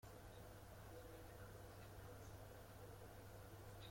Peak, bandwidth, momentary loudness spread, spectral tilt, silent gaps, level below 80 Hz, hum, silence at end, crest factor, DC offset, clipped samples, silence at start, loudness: -46 dBFS; 16.5 kHz; 1 LU; -5 dB/octave; none; -66 dBFS; none; 0 s; 12 dB; under 0.1%; under 0.1%; 0 s; -59 LUFS